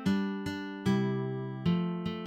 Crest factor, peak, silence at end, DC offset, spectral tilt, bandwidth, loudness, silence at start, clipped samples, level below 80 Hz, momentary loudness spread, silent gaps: 14 dB; -18 dBFS; 0 s; under 0.1%; -7.5 dB/octave; 11.5 kHz; -32 LUFS; 0 s; under 0.1%; -62 dBFS; 6 LU; none